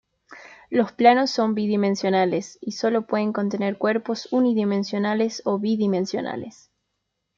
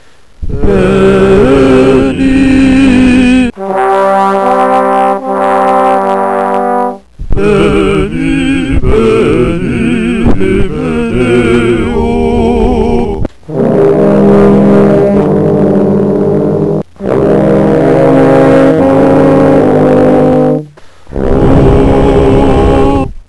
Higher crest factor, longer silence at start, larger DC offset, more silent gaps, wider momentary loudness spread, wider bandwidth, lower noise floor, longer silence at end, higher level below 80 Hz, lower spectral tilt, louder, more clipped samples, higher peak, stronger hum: first, 20 dB vs 8 dB; about the same, 0.3 s vs 0.4 s; second, under 0.1% vs 2%; neither; about the same, 9 LU vs 7 LU; second, 7.6 kHz vs 11 kHz; first, -78 dBFS vs -31 dBFS; first, 0.9 s vs 0.1 s; second, -70 dBFS vs -20 dBFS; second, -6 dB/octave vs -8 dB/octave; second, -22 LUFS vs -8 LUFS; second, under 0.1% vs 2%; second, -4 dBFS vs 0 dBFS; first, 50 Hz at -45 dBFS vs none